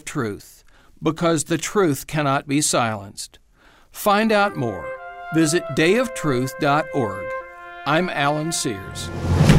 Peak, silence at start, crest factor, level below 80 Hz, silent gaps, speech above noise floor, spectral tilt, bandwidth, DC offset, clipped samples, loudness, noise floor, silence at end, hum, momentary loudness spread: -2 dBFS; 0.05 s; 20 dB; -42 dBFS; none; 31 dB; -5 dB/octave; 16 kHz; under 0.1%; under 0.1%; -21 LUFS; -52 dBFS; 0 s; none; 13 LU